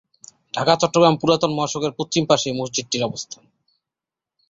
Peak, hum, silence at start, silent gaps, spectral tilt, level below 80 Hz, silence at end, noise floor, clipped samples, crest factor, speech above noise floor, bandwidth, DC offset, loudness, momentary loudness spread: 0 dBFS; none; 0.55 s; none; -4 dB/octave; -58 dBFS; 1.15 s; -88 dBFS; under 0.1%; 20 dB; 68 dB; 8 kHz; under 0.1%; -20 LUFS; 14 LU